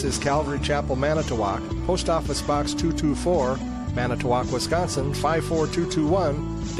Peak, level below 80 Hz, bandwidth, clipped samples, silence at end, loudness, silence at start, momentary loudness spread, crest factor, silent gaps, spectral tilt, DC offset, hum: -10 dBFS; -34 dBFS; 14.5 kHz; under 0.1%; 0 s; -24 LUFS; 0 s; 4 LU; 14 dB; none; -5.5 dB/octave; under 0.1%; none